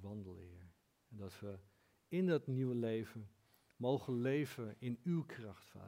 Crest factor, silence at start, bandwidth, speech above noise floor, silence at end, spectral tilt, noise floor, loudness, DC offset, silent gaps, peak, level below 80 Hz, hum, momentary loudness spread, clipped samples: 18 dB; 0 s; 16 kHz; 26 dB; 0 s; -8 dB/octave; -66 dBFS; -41 LUFS; under 0.1%; none; -24 dBFS; -82 dBFS; none; 19 LU; under 0.1%